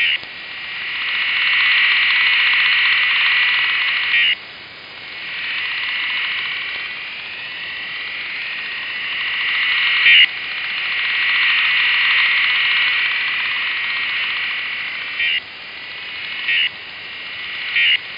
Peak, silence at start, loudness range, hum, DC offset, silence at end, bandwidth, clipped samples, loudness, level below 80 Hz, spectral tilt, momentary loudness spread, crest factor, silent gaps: -4 dBFS; 0 s; 9 LU; none; under 0.1%; 0 s; 5.4 kHz; under 0.1%; -16 LUFS; -64 dBFS; -1.5 dB/octave; 14 LU; 16 dB; none